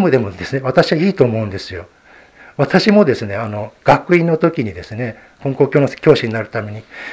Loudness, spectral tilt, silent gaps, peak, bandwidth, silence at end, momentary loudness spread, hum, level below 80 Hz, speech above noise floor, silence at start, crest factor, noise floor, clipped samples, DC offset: -16 LUFS; -7 dB/octave; none; 0 dBFS; 8 kHz; 0 s; 14 LU; none; -46 dBFS; 28 dB; 0 s; 16 dB; -44 dBFS; under 0.1%; under 0.1%